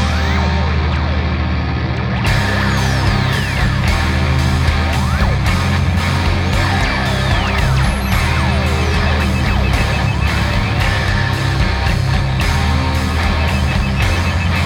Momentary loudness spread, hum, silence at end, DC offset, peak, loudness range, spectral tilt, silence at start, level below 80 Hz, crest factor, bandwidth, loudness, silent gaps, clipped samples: 1 LU; none; 0 s; under 0.1%; -2 dBFS; 1 LU; -5.5 dB/octave; 0 s; -20 dBFS; 12 dB; 16 kHz; -16 LUFS; none; under 0.1%